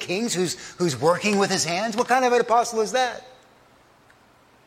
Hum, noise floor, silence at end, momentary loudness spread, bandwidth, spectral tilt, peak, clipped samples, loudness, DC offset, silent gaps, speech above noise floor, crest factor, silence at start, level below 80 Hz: none; -56 dBFS; 1.35 s; 7 LU; 16 kHz; -3.5 dB/octave; -6 dBFS; under 0.1%; -22 LUFS; under 0.1%; none; 34 dB; 18 dB; 0 s; -66 dBFS